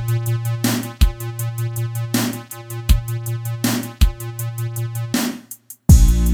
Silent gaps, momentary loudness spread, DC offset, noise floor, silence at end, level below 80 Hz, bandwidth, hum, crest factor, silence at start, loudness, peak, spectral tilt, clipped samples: none; 13 LU; under 0.1%; -40 dBFS; 0 s; -22 dBFS; 19 kHz; none; 18 dB; 0 s; -20 LUFS; 0 dBFS; -5 dB/octave; under 0.1%